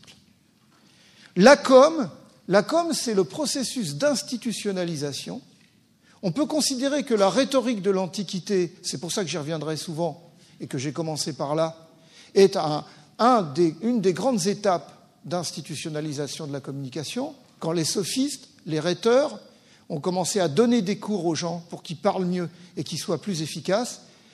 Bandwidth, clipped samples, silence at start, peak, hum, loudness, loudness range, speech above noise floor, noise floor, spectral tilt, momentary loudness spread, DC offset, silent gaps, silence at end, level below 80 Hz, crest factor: 13.5 kHz; under 0.1%; 0.1 s; -2 dBFS; none; -24 LUFS; 8 LU; 36 dB; -60 dBFS; -4.5 dB/octave; 13 LU; under 0.1%; none; 0.35 s; -72 dBFS; 22 dB